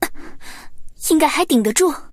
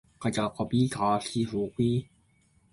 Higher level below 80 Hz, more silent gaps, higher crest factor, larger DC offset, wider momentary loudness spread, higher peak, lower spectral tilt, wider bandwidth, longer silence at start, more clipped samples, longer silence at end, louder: first, -40 dBFS vs -58 dBFS; neither; about the same, 16 dB vs 16 dB; neither; first, 23 LU vs 5 LU; first, -2 dBFS vs -14 dBFS; second, -3 dB/octave vs -6.5 dB/octave; first, 16 kHz vs 11.5 kHz; second, 0 s vs 0.2 s; neither; second, 0.05 s vs 0.7 s; first, -17 LUFS vs -29 LUFS